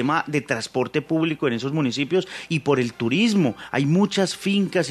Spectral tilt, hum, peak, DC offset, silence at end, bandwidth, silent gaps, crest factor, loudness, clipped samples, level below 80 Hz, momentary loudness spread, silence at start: -5.5 dB/octave; none; -6 dBFS; under 0.1%; 0 s; 13.5 kHz; none; 16 dB; -22 LUFS; under 0.1%; -64 dBFS; 5 LU; 0 s